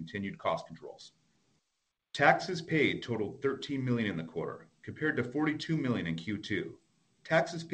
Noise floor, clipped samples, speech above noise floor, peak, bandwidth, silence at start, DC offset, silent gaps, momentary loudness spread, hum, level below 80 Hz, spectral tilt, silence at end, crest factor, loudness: -83 dBFS; under 0.1%; 51 dB; -10 dBFS; 9.2 kHz; 0 s; under 0.1%; none; 17 LU; none; -68 dBFS; -6 dB/octave; 0 s; 22 dB; -32 LUFS